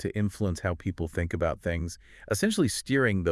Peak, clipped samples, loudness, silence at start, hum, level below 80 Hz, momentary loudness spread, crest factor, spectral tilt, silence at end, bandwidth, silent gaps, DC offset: -12 dBFS; under 0.1%; -29 LUFS; 0 s; none; -48 dBFS; 8 LU; 16 dB; -5.5 dB/octave; 0 s; 12 kHz; none; under 0.1%